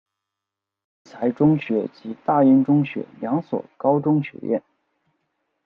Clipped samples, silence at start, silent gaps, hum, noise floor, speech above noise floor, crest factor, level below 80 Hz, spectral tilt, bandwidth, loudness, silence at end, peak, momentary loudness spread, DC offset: under 0.1%; 1.15 s; none; none; -85 dBFS; 65 dB; 16 dB; -66 dBFS; -10.5 dB/octave; 5.2 kHz; -21 LUFS; 1.05 s; -6 dBFS; 13 LU; under 0.1%